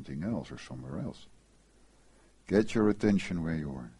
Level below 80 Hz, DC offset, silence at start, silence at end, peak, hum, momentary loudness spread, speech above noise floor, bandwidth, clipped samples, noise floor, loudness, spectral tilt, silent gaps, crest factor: -54 dBFS; under 0.1%; 0 s; 0.1 s; -12 dBFS; none; 15 LU; 31 dB; 11.5 kHz; under 0.1%; -62 dBFS; -31 LUFS; -7 dB/octave; none; 22 dB